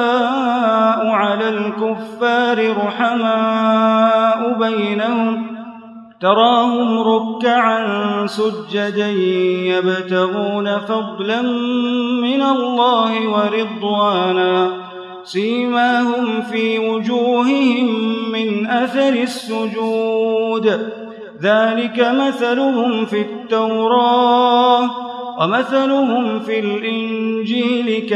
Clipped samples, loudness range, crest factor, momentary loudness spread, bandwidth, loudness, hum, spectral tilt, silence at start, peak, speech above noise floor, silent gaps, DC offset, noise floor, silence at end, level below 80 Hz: under 0.1%; 3 LU; 16 dB; 7 LU; 11.5 kHz; -16 LUFS; none; -6 dB/octave; 0 s; 0 dBFS; 21 dB; none; under 0.1%; -37 dBFS; 0 s; -72 dBFS